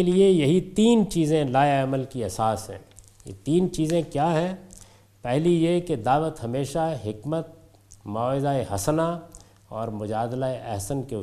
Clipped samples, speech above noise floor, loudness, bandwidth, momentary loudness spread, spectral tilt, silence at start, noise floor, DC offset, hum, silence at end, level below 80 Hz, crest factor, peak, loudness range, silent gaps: under 0.1%; 27 dB; -24 LUFS; 14.5 kHz; 15 LU; -6.5 dB/octave; 0 s; -51 dBFS; under 0.1%; none; 0 s; -50 dBFS; 18 dB; -6 dBFS; 5 LU; none